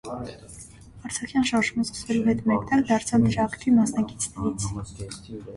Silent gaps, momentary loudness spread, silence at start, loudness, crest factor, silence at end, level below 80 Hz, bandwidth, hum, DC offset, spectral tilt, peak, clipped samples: none; 17 LU; 0.05 s; -24 LUFS; 16 dB; 0 s; -48 dBFS; 11.5 kHz; none; under 0.1%; -5 dB/octave; -10 dBFS; under 0.1%